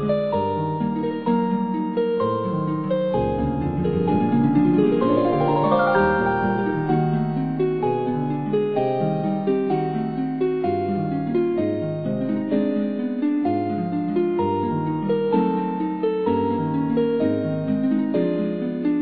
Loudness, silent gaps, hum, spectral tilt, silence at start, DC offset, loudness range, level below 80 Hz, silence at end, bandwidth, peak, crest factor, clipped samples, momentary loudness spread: -22 LUFS; none; none; -11.5 dB/octave; 0 s; 0.3%; 4 LU; -48 dBFS; 0 s; 5 kHz; -6 dBFS; 16 dB; under 0.1%; 6 LU